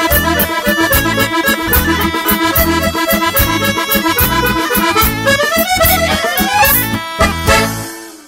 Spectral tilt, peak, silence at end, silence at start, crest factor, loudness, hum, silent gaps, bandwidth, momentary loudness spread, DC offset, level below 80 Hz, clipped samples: -3.5 dB/octave; 0 dBFS; 0.05 s; 0 s; 12 dB; -11 LUFS; none; none; 17 kHz; 4 LU; under 0.1%; -26 dBFS; under 0.1%